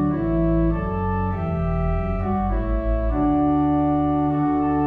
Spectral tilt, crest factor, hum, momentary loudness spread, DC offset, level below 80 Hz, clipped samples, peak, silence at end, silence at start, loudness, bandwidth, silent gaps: -11.5 dB/octave; 10 dB; none; 5 LU; under 0.1%; -28 dBFS; under 0.1%; -10 dBFS; 0 s; 0 s; -22 LUFS; 4.1 kHz; none